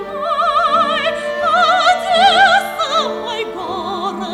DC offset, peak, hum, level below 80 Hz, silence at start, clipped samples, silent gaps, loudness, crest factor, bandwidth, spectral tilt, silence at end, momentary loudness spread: under 0.1%; -2 dBFS; none; -52 dBFS; 0 s; under 0.1%; none; -14 LUFS; 14 dB; 14.5 kHz; -2 dB/octave; 0 s; 11 LU